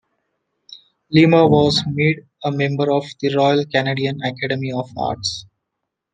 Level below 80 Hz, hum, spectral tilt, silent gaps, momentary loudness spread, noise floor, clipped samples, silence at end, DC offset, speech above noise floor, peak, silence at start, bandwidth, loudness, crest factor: -54 dBFS; none; -6 dB/octave; none; 12 LU; -79 dBFS; under 0.1%; 0.7 s; under 0.1%; 62 dB; -2 dBFS; 0.7 s; 9.4 kHz; -18 LUFS; 18 dB